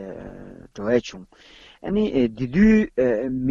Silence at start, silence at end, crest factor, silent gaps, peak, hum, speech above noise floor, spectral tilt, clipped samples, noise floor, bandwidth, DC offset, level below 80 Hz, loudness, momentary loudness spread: 0 s; 0 s; 16 dB; none; -6 dBFS; none; 20 dB; -7.5 dB/octave; under 0.1%; -40 dBFS; 7.2 kHz; under 0.1%; -42 dBFS; -21 LUFS; 22 LU